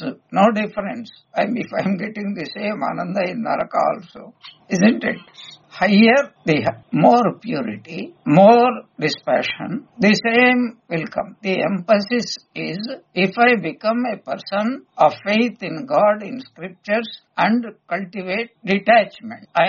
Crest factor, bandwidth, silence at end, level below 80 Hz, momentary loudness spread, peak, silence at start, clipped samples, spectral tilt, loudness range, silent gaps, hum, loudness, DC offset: 18 dB; 7.2 kHz; 0 s; -62 dBFS; 14 LU; 0 dBFS; 0 s; under 0.1%; -4 dB/octave; 6 LU; none; none; -19 LUFS; under 0.1%